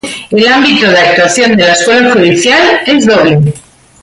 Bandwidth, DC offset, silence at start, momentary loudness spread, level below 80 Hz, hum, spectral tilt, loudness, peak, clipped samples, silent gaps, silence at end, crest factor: 11.5 kHz; under 0.1%; 0.05 s; 4 LU; -44 dBFS; none; -4 dB/octave; -6 LUFS; 0 dBFS; under 0.1%; none; 0.45 s; 8 dB